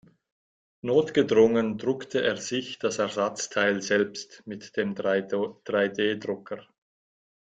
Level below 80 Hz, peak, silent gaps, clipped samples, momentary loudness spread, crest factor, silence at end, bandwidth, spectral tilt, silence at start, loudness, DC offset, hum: -66 dBFS; -8 dBFS; none; under 0.1%; 13 LU; 20 dB; 0.9 s; 9.2 kHz; -4 dB/octave; 0.85 s; -26 LUFS; under 0.1%; none